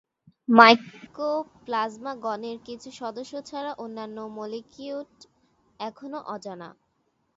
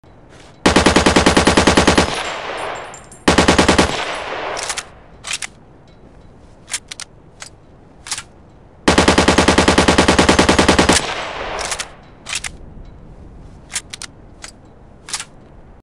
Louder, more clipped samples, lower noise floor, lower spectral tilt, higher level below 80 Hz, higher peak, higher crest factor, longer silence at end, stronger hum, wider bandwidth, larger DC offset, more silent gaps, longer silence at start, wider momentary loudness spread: second, -24 LUFS vs -15 LUFS; neither; first, -72 dBFS vs -44 dBFS; about the same, -4.5 dB/octave vs -3.5 dB/octave; second, -72 dBFS vs -32 dBFS; about the same, 0 dBFS vs 0 dBFS; first, 26 dB vs 16 dB; first, 0.65 s vs 0.2 s; neither; second, 7.8 kHz vs 15.5 kHz; neither; neither; second, 0.5 s vs 0.65 s; about the same, 23 LU vs 22 LU